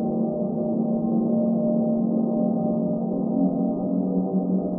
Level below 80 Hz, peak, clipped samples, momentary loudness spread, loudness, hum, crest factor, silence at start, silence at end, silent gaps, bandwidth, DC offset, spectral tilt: -58 dBFS; -12 dBFS; under 0.1%; 3 LU; -24 LUFS; none; 12 dB; 0 s; 0 s; none; 1.4 kHz; under 0.1%; -17 dB/octave